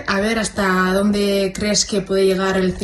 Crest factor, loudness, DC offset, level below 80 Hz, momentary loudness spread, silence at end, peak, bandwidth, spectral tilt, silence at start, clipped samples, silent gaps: 14 dB; -18 LUFS; under 0.1%; -40 dBFS; 2 LU; 0 s; -4 dBFS; 13 kHz; -4 dB/octave; 0 s; under 0.1%; none